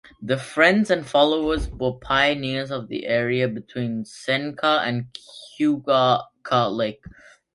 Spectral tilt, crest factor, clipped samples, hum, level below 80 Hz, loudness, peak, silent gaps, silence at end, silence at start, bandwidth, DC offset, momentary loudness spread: -5.5 dB/octave; 20 dB; under 0.1%; none; -44 dBFS; -22 LUFS; -2 dBFS; none; 0.45 s; 0.2 s; 11.5 kHz; under 0.1%; 11 LU